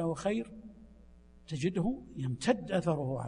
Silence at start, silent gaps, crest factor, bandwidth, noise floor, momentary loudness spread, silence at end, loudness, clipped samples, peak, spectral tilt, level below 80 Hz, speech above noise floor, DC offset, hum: 0 s; none; 20 dB; 10.5 kHz; -57 dBFS; 14 LU; 0 s; -34 LUFS; under 0.1%; -14 dBFS; -6.5 dB/octave; -58 dBFS; 24 dB; under 0.1%; none